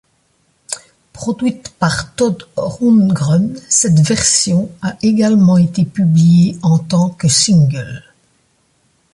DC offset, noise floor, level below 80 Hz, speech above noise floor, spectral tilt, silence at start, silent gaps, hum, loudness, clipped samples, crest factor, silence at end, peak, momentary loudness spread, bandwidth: under 0.1%; -59 dBFS; -46 dBFS; 47 dB; -5 dB/octave; 0.7 s; none; none; -13 LUFS; under 0.1%; 14 dB; 1.15 s; 0 dBFS; 14 LU; 11.5 kHz